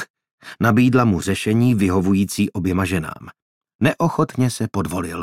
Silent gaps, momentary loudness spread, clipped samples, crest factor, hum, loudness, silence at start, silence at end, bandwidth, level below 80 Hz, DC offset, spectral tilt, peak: 0.10-0.14 s, 0.31-0.38 s, 3.42-3.61 s, 3.75-3.79 s; 9 LU; under 0.1%; 18 dB; none; -19 LUFS; 0 s; 0 s; 16 kHz; -50 dBFS; under 0.1%; -6.5 dB/octave; 0 dBFS